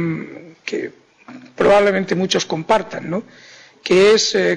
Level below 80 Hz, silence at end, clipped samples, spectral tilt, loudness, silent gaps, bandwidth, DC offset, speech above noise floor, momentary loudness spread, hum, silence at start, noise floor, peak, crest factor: -52 dBFS; 0 s; under 0.1%; -4 dB/octave; -17 LUFS; none; 10.5 kHz; under 0.1%; 24 dB; 17 LU; none; 0 s; -41 dBFS; -6 dBFS; 12 dB